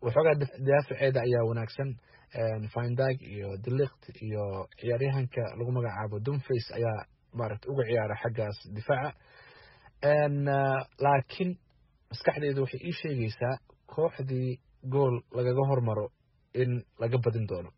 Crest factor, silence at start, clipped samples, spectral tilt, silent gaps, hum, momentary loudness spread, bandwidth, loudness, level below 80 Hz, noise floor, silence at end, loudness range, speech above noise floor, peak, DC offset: 20 dB; 0 s; under 0.1%; -6.5 dB/octave; none; none; 11 LU; 5.8 kHz; -31 LUFS; -62 dBFS; -60 dBFS; 0.05 s; 3 LU; 31 dB; -10 dBFS; under 0.1%